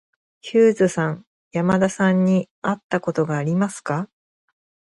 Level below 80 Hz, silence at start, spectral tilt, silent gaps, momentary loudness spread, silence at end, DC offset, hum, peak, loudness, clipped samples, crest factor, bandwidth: -60 dBFS; 0.45 s; -7 dB/octave; 1.27-1.51 s, 2.51-2.62 s, 2.83-2.89 s; 11 LU; 0.85 s; under 0.1%; none; -4 dBFS; -21 LUFS; under 0.1%; 16 dB; 11.5 kHz